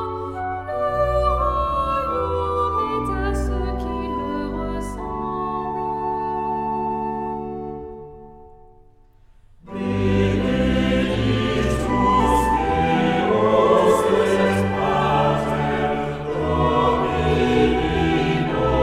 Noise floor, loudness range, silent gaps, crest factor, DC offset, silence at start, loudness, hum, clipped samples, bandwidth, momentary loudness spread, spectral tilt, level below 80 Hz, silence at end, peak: -50 dBFS; 9 LU; none; 18 dB; under 0.1%; 0 s; -21 LUFS; none; under 0.1%; 15 kHz; 10 LU; -6.5 dB/octave; -32 dBFS; 0 s; -4 dBFS